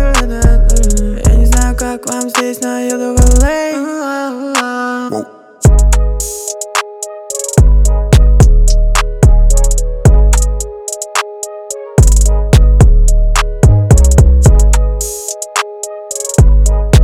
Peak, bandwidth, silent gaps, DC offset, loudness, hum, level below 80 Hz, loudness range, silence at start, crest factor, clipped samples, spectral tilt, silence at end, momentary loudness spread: 0 dBFS; 15 kHz; none; under 0.1%; -12 LUFS; none; -10 dBFS; 5 LU; 0 s; 8 dB; 0.3%; -5 dB/octave; 0 s; 11 LU